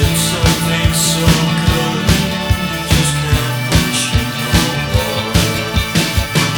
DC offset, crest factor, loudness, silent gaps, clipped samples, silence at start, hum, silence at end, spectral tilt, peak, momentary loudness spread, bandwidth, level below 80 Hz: under 0.1%; 14 dB; -14 LUFS; none; under 0.1%; 0 s; none; 0 s; -4 dB/octave; 0 dBFS; 4 LU; over 20 kHz; -24 dBFS